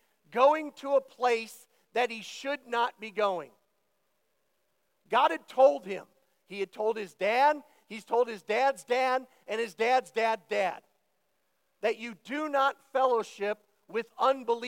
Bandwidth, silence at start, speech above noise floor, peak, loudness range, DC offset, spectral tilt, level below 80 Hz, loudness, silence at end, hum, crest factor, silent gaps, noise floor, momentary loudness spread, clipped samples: 16.5 kHz; 0.3 s; 48 dB; -10 dBFS; 4 LU; under 0.1%; -3.5 dB/octave; under -90 dBFS; -29 LUFS; 0 s; none; 20 dB; none; -77 dBFS; 13 LU; under 0.1%